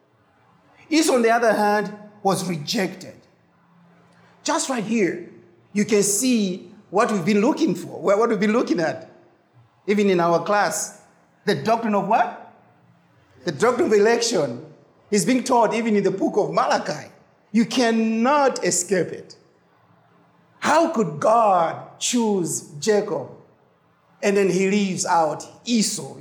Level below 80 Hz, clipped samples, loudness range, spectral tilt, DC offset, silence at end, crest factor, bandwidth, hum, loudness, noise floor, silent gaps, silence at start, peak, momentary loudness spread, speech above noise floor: -74 dBFS; under 0.1%; 3 LU; -4 dB/octave; under 0.1%; 0 s; 16 dB; over 20 kHz; none; -21 LUFS; -59 dBFS; none; 0.9 s; -6 dBFS; 11 LU; 39 dB